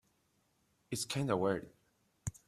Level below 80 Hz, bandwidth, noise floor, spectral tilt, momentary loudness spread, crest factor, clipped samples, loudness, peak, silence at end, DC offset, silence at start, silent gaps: -66 dBFS; 15.5 kHz; -76 dBFS; -5 dB/octave; 13 LU; 22 dB; under 0.1%; -37 LUFS; -18 dBFS; 0.15 s; under 0.1%; 0.9 s; none